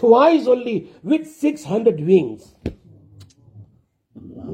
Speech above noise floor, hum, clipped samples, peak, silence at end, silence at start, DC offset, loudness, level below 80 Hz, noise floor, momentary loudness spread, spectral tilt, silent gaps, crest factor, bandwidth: 41 dB; none; under 0.1%; -2 dBFS; 0 s; 0 s; under 0.1%; -18 LUFS; -52 dBFS; -59 dBFS; 19 LU; -7.5 dB/octave; none; 18 dB; 12 kHz